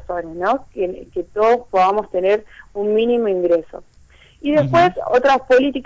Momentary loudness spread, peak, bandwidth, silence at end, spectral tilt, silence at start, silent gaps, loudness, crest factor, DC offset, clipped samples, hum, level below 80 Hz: 12 LU; -8 dBFS; 7.8 kHz; 0 s; -6.5 dB/octave; 0 s; none; -18 LUFS; 10 dB; under 0.1%; under 0.1%; none; -48 dBFS